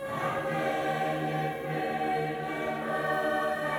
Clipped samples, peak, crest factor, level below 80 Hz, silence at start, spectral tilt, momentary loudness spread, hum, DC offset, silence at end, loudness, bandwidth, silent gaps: under 0.1%; -18 dBFS; 14 dB; -62 dBFS; 0 s; -6 dB/octave; 4 LU; none; under 0.1%; 0 s; -30 LUFS; over 20 kHz; none